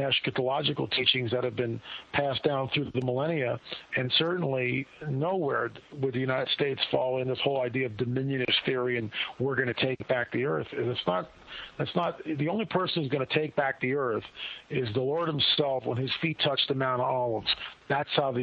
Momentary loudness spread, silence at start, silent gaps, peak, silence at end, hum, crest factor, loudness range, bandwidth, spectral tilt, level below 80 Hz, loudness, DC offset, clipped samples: 7 LU; 0 s; none; -10 dBFS; 0 s; none; 20 dB; 3 LU; 6.4 kHz; -7.5 dB/octave; -64 dBFS; -29 LUFS; under 0.1%; under 0.1%